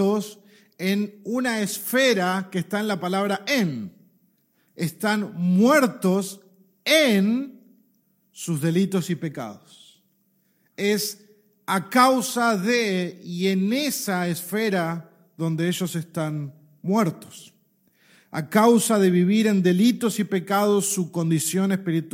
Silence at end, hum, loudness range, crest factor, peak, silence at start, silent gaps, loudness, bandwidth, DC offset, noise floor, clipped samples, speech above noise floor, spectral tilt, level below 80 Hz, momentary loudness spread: 0.05 s; none; 7 LU; 20 dB; -4 dBFS; 0 s; none; -22 LUFS; 16.5 kHz; under 0.1%; -66 dBFS; under 0.1%; 44 dB; -5 dB/octave; -74 dBFS; 14 LU